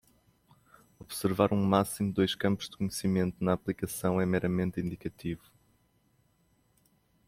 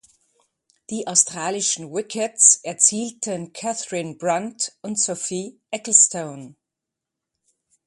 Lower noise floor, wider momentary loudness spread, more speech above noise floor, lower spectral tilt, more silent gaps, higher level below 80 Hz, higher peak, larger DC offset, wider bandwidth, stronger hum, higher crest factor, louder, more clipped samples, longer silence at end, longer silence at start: second, -70 dBFS vs -85 dBFS; second, 11 LU vs 17 LU; second, 40 dB vs 63 dB; first, -6 dB/octave vs -1.5 dB/octave; neither; first, -60 dBFS vs -72 dBFS; second, -10 dBFS vs 0 dBFS; neither; first, 16 kHz vs 11.5 kHz; neither; about the same, 22 dB vs 24 dB; second, -31 LUFS vs -19 LUFS; neither; first, 1.9 s vs 1.35 s; about the same, 1 s vs 0.9 s